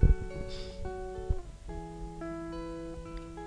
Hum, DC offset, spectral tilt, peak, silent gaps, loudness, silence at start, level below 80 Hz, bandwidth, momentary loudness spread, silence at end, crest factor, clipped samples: 50 Hz at -50 dBFS; under 0.1%; -7.5 dB/octave; -10 dBFS; none; -39 LUFS; 0 s; -34 dBFS; 10 kHz; 8 LU; 0 s; 22 dB; under 0.1%